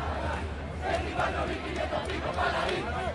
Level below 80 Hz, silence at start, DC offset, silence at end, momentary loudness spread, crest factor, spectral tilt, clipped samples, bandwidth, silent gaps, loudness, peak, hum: -40 dBFS; 0 s; under 0.1%; 0 s; 5 LU; 16 dB; -5.5 dB/octave; under 0.1%; 11.5 kHz; none; -31 LUFS; -14 dBFS; none